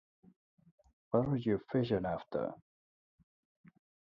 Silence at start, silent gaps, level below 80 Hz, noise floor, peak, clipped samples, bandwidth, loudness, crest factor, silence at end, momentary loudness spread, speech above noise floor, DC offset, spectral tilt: 1.1 s; none; -64 dBFS; under -90 dBFS; -16 dBFS; under 0.1%; 5.8 kHz; -35 LUFS; 22 dB; 1.6 s; 8 LU; over 56 dB; under 0.1%; -10 dB/octave